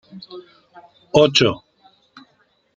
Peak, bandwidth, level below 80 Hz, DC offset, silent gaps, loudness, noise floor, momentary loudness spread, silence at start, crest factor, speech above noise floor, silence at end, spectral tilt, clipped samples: -2 dBFS; 9 kHz; -56 dBFS; under 0.1%; none; -16 LUFS; -62 dBFS; 25 LU; 0.15 s; 20 dB; 43 dB; 1.2 s; -4.5 dB/octave; under 0.1%